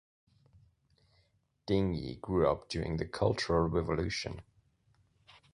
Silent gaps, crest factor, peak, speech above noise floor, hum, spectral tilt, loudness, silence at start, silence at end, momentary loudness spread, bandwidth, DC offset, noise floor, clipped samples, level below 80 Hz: none; 20 dB; -14 dBFS; 41 dB; none; -6.5 dB/octave; -33 LUFS; 1.65 s; 1.1 s; 9 LU; 11 kHz; under 0.1%; -73 dBFS; under 0.1%; -50 dBFS